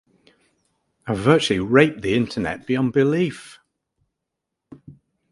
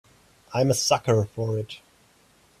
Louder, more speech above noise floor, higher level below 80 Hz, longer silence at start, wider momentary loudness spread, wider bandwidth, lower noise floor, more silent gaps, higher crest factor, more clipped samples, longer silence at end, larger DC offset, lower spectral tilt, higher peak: first, -20 LUFS vs -24 LUFS; first, 62 dB vs 36 dB; first, -52 dBFS vs -60 dBFS; first, 1.05 s vs 0.5 s; second, 11 LU vs 14 LU; second, 11.5 kHz vs 15.5 kHz; first, -82 dBFS vs -59 dBFS; neither; about the same, 22 dB vs 20 dB; neither; second, 0.4 s vs 0.85 s; neither; first, -6 dB/octave vs -4.5 dB/octave; first, 0 dBFS vs -8 dBFS